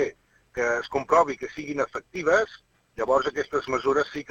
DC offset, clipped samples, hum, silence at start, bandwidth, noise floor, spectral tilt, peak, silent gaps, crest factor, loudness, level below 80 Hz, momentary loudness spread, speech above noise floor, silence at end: under 0.1%; under 0.1%; none; 0 s; 8 kHz; -44 dBFS; -4.5 dB/octave; -8 dBFS; none; 18 dB; -25 LUFS; -56 dBFS; 11 LU; 19 dB; 0.1 s